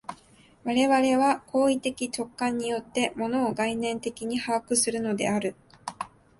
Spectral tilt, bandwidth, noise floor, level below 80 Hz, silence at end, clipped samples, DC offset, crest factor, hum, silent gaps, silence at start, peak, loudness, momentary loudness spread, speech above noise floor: -3.5 dB/octave; 11.5 kHz; -57 dBFS; -64 dBFS; 0.3 s; under 0.1%; under 0.1%; 16 dB; none; none; 0.1 s; -10 dBFS; -26 LUFS; 15 LU; 31 dB